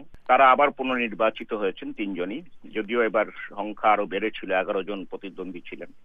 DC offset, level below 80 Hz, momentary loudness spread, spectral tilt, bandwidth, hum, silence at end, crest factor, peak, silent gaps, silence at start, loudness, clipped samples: under 0.1%; -58 dBFS; 18 LU; -7 dB/octave; 4.8 kHz; none; 0.05 s; 20 dB; -6 dBFS; none; 0 s; -24 LUFS; under 0.1%